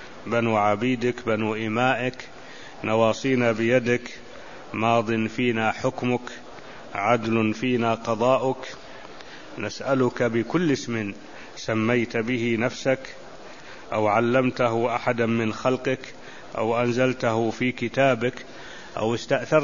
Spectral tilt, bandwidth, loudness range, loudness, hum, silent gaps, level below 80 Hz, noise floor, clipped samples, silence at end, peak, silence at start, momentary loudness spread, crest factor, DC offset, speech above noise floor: -6 dB/octave; 7.4 kHz; 2 LU; -24 LUFS; none; none; -58 dBFS; -43 dBFS; under 0.1%; 0 s; -4 dBFS; 0 s; 19 LU; 20 dB; 0.6%; 19 dB